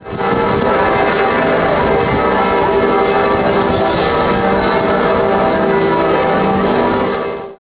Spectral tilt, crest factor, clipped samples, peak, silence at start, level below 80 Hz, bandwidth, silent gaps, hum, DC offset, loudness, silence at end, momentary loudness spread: -10 dB/octave; 12 dB; under 0.1%; -2 dBFS; 0 s; -34 dBFS; 4 kHz; none; none; under 0.1%; -13 LUFS; 0.05 s; 1 LU